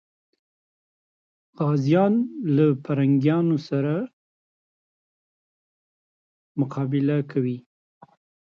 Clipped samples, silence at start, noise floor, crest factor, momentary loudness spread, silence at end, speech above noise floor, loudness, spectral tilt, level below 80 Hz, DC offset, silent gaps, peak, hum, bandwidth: under 0.1%; 1.6 s; under -90 dBFS; 18 dB; 10 LU; 0.9 s; over 68 dB; -23 LUFS; -9.5 dB/octave; -72 dBFS; under 0.1%; 4.13-6.55 s; -8 dBFS; none; 6.8 kHz